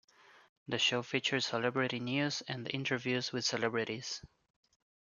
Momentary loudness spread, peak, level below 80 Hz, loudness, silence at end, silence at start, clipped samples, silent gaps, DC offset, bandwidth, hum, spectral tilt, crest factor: 9 LU; -16 dBFS; -76 dBFS; -34 LUFS; 0.9 s; 0.3 s; under 0.1%; 0.49-0.66 s; under 0.1%; 7.4 kHz; none; -3.5 dB/octave; 20 dB